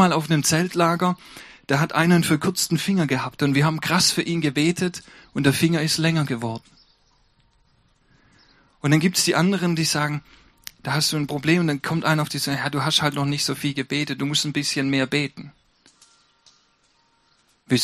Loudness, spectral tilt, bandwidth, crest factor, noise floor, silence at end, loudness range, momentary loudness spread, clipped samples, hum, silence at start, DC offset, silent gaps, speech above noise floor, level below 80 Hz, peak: -21 LUFS; -4.5 dB/octave; 15.5 kHz; 20 dB; -63 dBFS; 0 s; 5 LU; 10 LU; under 0.1%; none; 0 s; under 0.1%; none; 42 dB; -58 dBFS; -2 dBFS